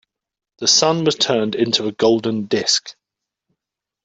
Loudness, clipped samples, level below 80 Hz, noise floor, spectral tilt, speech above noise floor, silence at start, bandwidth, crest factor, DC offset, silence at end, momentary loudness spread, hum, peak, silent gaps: -17 LUFS; under 0.1%; -62 dBFS; -84 dBFS; -3 dB/octave; 67 dB; 0.6 s; 8.4 kHz; 18 dB; under 0.1%; 1.15 s; 6 LU; none; -2 dBFS; none